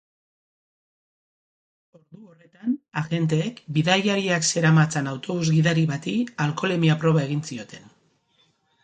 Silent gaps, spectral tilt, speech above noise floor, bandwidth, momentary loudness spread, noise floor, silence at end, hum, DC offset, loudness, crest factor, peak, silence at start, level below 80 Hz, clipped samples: none; -5 dB/octave; 42 dB; 9.4 kHz; 10 LU; -65 dBFS; 1.05 s; none; under 0.1%; -23 LUFS; 20 dB; -4 dBFS; 2.15 s; -64 dBFS; under 0.1%